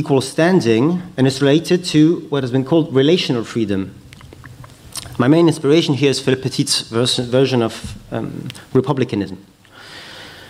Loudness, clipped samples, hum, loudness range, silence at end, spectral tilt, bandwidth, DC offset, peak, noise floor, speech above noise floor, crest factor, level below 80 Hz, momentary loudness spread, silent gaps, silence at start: -16 LUFS; under 0.1%; none; 4 LU; 0 s; -5.5 dB/octave; 15 kHz; under 0.1%; -2 dBFS; -39 dBFS; 23 dB; 16 dB; -50 dBFS; 17 LU; none; 0 s